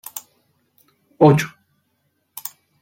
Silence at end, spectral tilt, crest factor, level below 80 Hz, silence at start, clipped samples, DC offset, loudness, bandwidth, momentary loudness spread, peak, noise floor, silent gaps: 1.35 s; -6.5 dB/octave; 20 dB; -60 dBFS; 0.15 s; under 0.1%; under 0.1%; -16 LUFS; 17 kHz; 21 LU; -2 dBFS; -69 dBFS; none